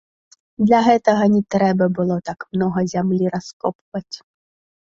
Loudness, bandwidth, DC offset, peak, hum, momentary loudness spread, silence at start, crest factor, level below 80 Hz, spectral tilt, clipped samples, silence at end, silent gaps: -18 LUFS; 7.6 kHz; under 0.1%; -2 dBFS; none; 15 LU; 0.6 s; 18 dB; -56 dBFS; -7 dB/octave; under 0.1%; 0.7 s; 3.53-3.60 s, 3.75-3.92 s